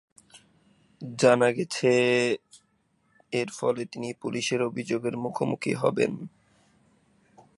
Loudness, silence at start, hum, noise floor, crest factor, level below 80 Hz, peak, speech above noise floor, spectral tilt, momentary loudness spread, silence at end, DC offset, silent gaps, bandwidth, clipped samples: -26 LUFS; 0.35 s; none; -69 dBFS; 22 dB; -72 dBFS; -6 dBFS; 44 dB; -5 dB/octave; 13 LU; 1.3 s; under 0.1%; none; 11.5 kHz; under 0.1%